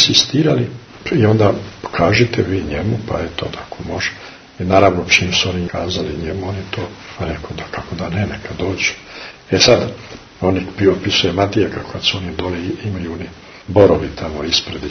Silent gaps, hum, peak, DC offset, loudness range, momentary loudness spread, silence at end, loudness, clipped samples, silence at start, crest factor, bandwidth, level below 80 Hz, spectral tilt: none; none; 0 dBFS; under 0.1%; 6 LU; 15 LU; 0 s; -17 LUFS; under 0.1%; 0 s; 18 dB; 11 kHz; -38 dBFS; -4.5 dB/octave